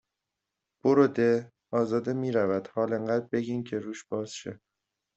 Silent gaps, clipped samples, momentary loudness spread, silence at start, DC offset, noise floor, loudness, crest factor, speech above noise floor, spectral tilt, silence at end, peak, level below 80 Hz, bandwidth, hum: none; under 0.1%; 12 LU; 0.85 s; under 0.1%; -86 dBFS; -28 LUFS; 20 dB; 59 dB; -7 dB/octave; 0.6 s; -8 dBFS; -70 dBFS; 8.2 kHz; none